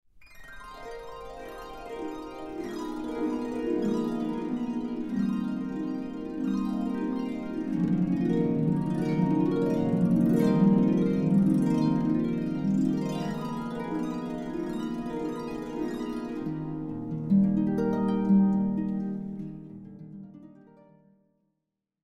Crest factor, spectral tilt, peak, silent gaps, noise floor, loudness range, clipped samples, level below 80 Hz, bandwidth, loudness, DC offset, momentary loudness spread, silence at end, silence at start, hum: 18 dB; -9 dB/octave; -10 dBFS; none; -84 dBFS; 9 LU; under 0.1%; -54 dBFS; 12 kHz; -28 LUFS; under 0.1%; 18 LU; 1.55 s; 0.15 s; none